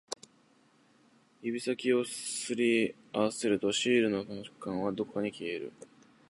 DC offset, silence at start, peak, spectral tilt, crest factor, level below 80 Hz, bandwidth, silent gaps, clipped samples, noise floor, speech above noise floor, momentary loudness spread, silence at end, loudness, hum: under 0.1%; 0.1 s; -14 dBFS; -4 dB/octave; 18 dB; -72 dBFS; 11.5 kHz; none; under 0.1%; -66 dBFS; 34 dB; 14 LU; 0.45 s; -32 LUFS; none